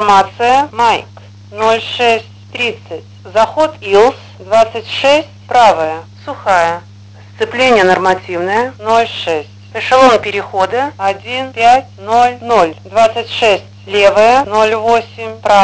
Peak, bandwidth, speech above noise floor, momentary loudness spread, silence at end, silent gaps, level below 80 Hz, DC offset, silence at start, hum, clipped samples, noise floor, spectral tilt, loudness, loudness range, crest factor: 0 dBFS; 8 kHz; 24 dB; 11 LU; 0 s; none; -48 dBFS; 0.3%; 0 s; none; 0.8%; -35 dBFS; -4 dB/octave; -12 LUFS; 3 LU; 12 dB